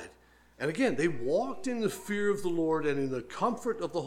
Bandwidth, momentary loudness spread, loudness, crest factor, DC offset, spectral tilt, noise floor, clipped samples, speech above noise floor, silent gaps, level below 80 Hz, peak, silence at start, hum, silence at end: 16.5 kHz; 6 LU; -31 LUFS; 16 dB; under 0.1%; -5.5 dB/octave; -60 dBFS; under 0.1%; 30 dB; none; -64 dBFS; -14 dBFS; 0 s; none; 0 s